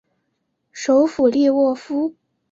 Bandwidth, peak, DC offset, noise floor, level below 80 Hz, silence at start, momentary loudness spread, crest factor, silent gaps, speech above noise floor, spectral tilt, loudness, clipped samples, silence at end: 7.8 kHz; -4 dBFS; under 0.1%; -72 dBFS; -62 dBFS; 0.75 s; 10 LU; 14 dB; none; 55 dB; -4.5 dB/octave; -18 LUFS; under 0.1%; 0.4 s